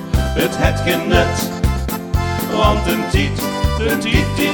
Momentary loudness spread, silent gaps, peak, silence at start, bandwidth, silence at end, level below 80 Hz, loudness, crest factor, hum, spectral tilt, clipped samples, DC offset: 5 LU; none; 0 dBFS; 0 s; over 20 kHz; 0 s; -22 dBFS; -17 LUFS; 16 dB; none; -5 dB/octave; under 0.1%; under 0.1%